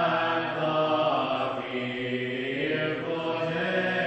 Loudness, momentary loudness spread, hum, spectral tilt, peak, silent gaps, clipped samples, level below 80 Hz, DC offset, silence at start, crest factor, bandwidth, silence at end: -28 LUFS; 5 LU; none; -6.5 dB/octave; -12 dBFS; none; under 0.1%; -66 dBFS; under 0.1%; 0 s; 14 dB; 8.2 kHz; 0 s